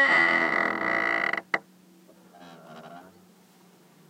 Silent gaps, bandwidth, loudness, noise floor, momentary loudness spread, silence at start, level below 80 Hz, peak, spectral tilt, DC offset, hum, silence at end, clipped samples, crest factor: none; 16 kHz; -24 LUFS; -57 dBFS; 27 LU; 0 s; -80 dBFS; -8 dBFS; -4 dB/octave; under 0.1%; none; 1.1 s; under 0.1%; 20 dB